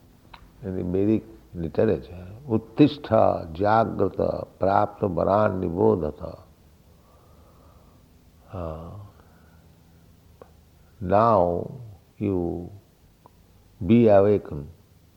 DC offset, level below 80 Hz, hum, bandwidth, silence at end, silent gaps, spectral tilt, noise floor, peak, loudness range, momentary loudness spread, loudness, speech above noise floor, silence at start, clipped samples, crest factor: under 0.1%; -50 dBFS; none; 16 kHz; 0.45 s; none; -9.5 dB/octave; -55 dBFS; -4 dBFS; 20 LU; 20 LU; -23 LUFS; 33 dB; 0.6 s; under 0.1%; 20 dB